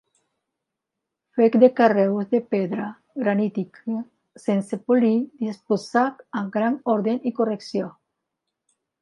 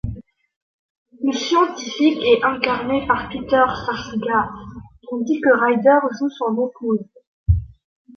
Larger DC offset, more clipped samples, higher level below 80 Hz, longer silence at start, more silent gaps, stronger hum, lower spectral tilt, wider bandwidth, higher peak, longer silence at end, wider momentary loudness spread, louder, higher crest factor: neither; neither; second, -76 dBFS vs -36 dBFS; first, 1.35 s vs 0.05 s; second, none vs 0.56-1.06 s, 7.27-7.46 s; neither; first, -7.5 dB/octave vs -6 dB/octave; first, 11 kHz vs 7.2 kHz; about the same, -2 dBFS vs -2 dBFS; first, 1.1 s vs 0.5 s; about the same, 14 LU vs 13 LU; second, -22 LUFS vs -19 LUFS; about the same, 20 dB vs 18 dB